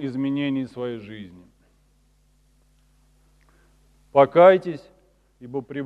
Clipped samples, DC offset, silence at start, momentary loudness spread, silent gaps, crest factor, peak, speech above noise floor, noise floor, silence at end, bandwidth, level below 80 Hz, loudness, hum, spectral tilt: under 0.1%; under 0.1%; 0 s; 25 LU; none; 22 dB; -2 dBFS; 40 dB; -61 dBFS; 0 s; 5.2 kHz; -62 dBFS; -20 LUFS; none; -8 dB/octave